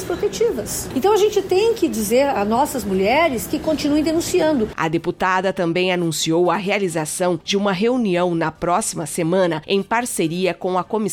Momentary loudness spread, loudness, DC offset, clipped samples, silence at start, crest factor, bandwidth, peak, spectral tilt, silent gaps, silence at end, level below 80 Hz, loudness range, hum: 4 LU; -19 LUFS; under 0.1%; under 0.1%; 0 s; 14 dB; 17.5 kHz; -6 dBFS; -4.5 dB/octave; none; 0 s; -46 dBFS; 2 LU; none